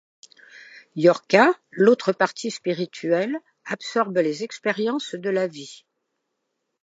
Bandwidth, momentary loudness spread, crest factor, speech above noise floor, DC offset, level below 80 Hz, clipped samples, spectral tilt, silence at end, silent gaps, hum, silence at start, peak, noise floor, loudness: 8 kHz; 14 LU; 22 dB; 56 dB; under 0.1%; -80 dBFS; under 0.1%; -5 dB/octave; 1.1 s; none; none; 0.75 s; -2 dBFS; -78 dBFS; -22 LUFS